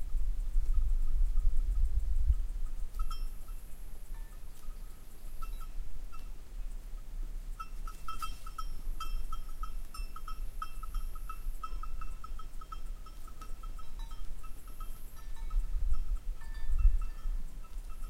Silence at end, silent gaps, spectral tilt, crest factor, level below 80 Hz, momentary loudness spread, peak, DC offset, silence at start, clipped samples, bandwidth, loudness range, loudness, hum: 0 s; none; -5 dB/octave; 18 dB; -34 dBFS; 15 LU; -14 dBFS; under 0.1%; 0 s; under 0.1%; 13.5 kHz; 11 LU; -42 LUFS; none